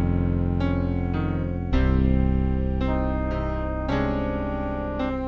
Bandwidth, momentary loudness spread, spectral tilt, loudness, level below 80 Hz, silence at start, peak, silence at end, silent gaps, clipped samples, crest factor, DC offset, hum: 6.2 kHz; 6 LU; -9.5 dB/octave; -25 LUFS; -28 dBFS; 0 s; -10 dBFS; 0 s; none; under 0.1%; 14 dB; under 0.1%; none